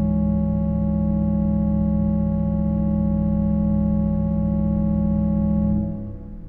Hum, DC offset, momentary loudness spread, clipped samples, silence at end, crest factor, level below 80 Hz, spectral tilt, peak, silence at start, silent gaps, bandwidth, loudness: none; under 0.1%; 2 LU; under 0.1%; 0 s; 10 dB; -28 dBFS; -14 dB/octave; -10 dBFS; 0 s; none; 2.3 kHz; -21 LUFS